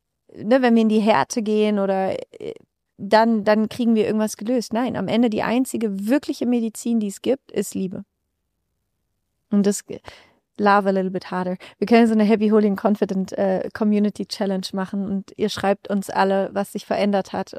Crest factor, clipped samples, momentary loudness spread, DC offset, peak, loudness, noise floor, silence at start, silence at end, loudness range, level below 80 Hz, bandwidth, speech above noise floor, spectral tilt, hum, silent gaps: 18 dB; under 0.1%; 10 LU; under 0.1%; -4 dBFS; -21 LUFS; -75 dBFS; 0.35 s; 0 s; 6 LU; -64 dBFS; 15 kHz; 55 dB; -6 dB/octave; none; none